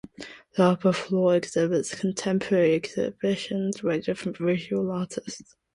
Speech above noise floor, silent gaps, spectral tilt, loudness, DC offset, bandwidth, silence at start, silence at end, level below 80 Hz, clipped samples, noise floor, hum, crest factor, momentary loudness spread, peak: 20 dB; none; -6 dB/octave; -26 LUFS; under 0.1%; 11.5 kHz; 0.2 s; 0.35 s; -64 dBFS; under 0.1%; -45 dBFS; none; 20 dB; 11 LU; -6 dBFS